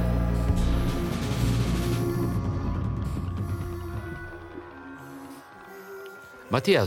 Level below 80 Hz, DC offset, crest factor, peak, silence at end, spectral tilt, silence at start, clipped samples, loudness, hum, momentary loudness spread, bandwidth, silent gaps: -34 dBFS; under 0.1%; 18 dB; -10 dBFS; 0 s; -6.5 dB/octave; 0 s; under 0.1%; -28 LUFS; none; 17 LU; 17 kHz; none